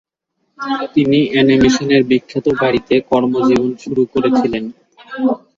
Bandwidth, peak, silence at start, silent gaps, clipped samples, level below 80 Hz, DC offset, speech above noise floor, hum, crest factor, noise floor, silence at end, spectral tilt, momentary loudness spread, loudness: 7.6 kHz; -2 dBFS; 0.6 s; none; under 0.1%; -46 dBFS; under 0.1%; 55 dB; none; 14 dB; -69 dBFS; 0.2 s; -6 dB/octave; 10 LU; -15 LUFS